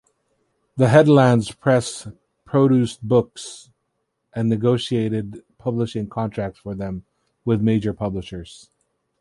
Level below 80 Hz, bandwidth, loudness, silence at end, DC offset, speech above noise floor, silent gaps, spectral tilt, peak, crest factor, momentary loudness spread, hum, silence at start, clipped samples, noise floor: -50 dBFS; 11.5 kHz; -20 LUFS; 0.65 s; under 0.1%; 55 dB; none; -7 dB/octave; -2 dBFS; 18 dB; 21 LU; none; 0.75 s; under 0.1%; -74 dBFS